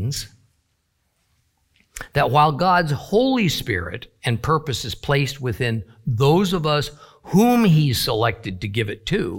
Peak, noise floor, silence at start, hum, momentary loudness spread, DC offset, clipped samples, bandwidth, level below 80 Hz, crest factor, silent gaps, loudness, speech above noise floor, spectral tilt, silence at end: -4 dBFS; -69 dBFS; 0 s; none; 11 LU; under 0.1%; under 0.1%; 17 kHz; -44 dBFS; 18 dB; none; -20 LUFS; 49 dB; -5.5 dB/octave; 0 s